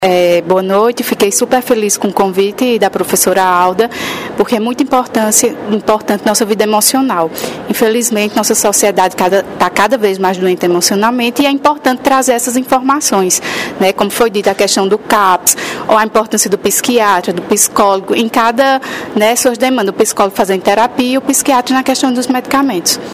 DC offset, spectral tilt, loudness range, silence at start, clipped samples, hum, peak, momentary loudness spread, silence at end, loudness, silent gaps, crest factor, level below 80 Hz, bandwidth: under 0.1%; -3 dB/octave; 1 LU; 0 s; 0.2%; none; 0 dBFS; 4 LU; 0 s; -11 LUFS; none; 12 dB; -50 dBFS; over 20 kHz